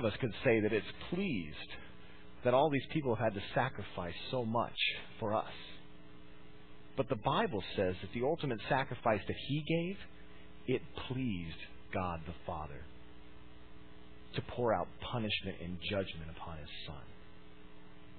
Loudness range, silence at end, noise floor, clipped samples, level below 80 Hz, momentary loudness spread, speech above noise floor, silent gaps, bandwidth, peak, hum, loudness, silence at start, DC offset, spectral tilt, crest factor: 7 LU; 0 s; -57 dBFS; under 0.1%; -58 dBFS; 24 LU; 21 dB; none; 4.6 kHz; -16 dBFS; none; -37 LUFS; 0 s; 0.4%; -4 dB/octave; 22 dB